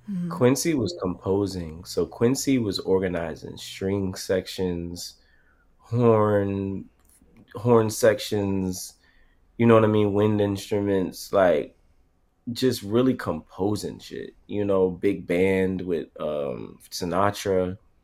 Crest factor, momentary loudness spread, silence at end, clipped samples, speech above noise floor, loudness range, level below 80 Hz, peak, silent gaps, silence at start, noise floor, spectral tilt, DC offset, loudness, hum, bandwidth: 22 dB; 14 LU; 0.25 s; under 0.1%; 39 dB; 4 LU; -54 dBFS; -4 dBFS; none; 0.05 s; -63 dBFS; -6 dB/octave; under 0.1%; -24 LUFS; none; 16 kHz